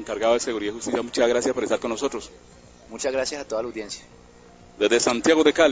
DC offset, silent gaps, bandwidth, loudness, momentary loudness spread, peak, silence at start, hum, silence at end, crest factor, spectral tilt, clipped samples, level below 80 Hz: under 0.1%; none; 8 kHz; -23 LUFS; 16 LU; -2 dBFS; 0 s; 60 Hz at -55 dBFS; 0 s; 22 dB; -2.5 dB/octave; under 0.1%; -54 dBFS